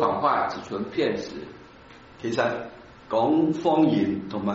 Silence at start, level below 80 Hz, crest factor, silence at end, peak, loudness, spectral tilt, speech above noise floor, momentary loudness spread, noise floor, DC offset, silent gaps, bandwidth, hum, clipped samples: 0 s; -60 dBFS; 18 dB; 0 s; -8 dBFS; -25 LUFS; -5 dB/octave; 24 dB; 15 LU; -48 dBFS; under 0.1%; none; 7.6 kHz; none; under 0.1%